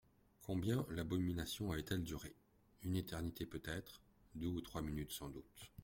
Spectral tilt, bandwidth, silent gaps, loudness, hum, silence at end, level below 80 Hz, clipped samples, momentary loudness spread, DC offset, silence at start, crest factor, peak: -5.5 dB/octave; 16.5 kHz; none; -44 LUFS; none; 0 s; -60 dBFS; under 0.1%; 16 LU; under 0.1%; 0.4 s; 20 dB; -26 dBFS